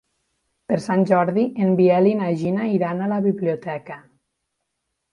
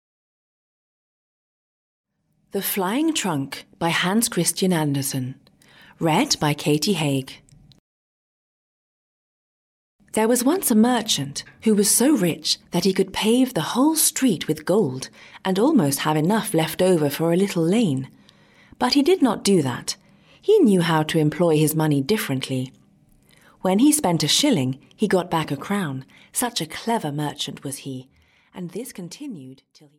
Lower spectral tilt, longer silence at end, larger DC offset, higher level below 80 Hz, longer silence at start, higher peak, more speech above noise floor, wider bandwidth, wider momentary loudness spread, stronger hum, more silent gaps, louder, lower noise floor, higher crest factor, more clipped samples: first, -8.5 dB/octave vs -4.5 dB/octave; first, 1.15 s vs 0.45 s; neither; second, -66 dBFS vs -60 dBFS; second, 0.7 s vs 2.55 s; about the same, -4 dBFS vs -6 dBFS; first, 58 dB vs 36 dB; second, 10.5 kHz vs 17 kHz; about the same, 13 LU vs 15 LU; neither; second, none vs 7.79-9.99 s; about the same, -20 LUFS vs -21 LUFS; first, -77 dBFS vs -57 dBFS; about the same, 18 dB vs 18 dB; neither